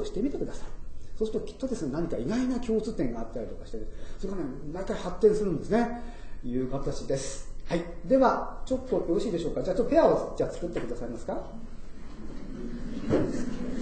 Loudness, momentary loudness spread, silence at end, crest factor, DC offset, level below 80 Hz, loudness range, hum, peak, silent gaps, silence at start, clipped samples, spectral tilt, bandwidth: -30 LUFS; 19 LU; 0 s; 20 dB; under 0.1%; -40 dBFS; 6 LU; none; -10 dBFS; none; 0 s; under 0.1%; -6.5 dB/octave; 9 kHz